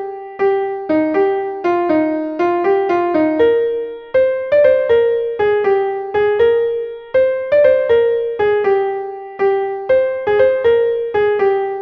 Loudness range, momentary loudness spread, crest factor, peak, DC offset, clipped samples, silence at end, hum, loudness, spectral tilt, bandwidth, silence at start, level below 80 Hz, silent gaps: 1 LU; 6 LU; 14 dB; -2 dBFS; under 0.1%; under 0.1%; 0 s; none; -15 LUFS; -7.5 dB/octave; 5.6 kHz; 0 s; -52 dBFS; none